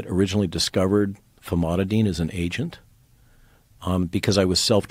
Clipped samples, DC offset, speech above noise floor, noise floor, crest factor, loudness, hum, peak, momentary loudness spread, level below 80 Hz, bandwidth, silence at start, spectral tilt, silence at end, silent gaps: under 0.1%; under 0.1%; 33 dB; -55 dBFS; 18 dB; -23 LUFS; none; -6 dBFS; 9 LU; -48 dBFS; 16 kHz; 0 s; -5 dB/octave; 0.05 s; none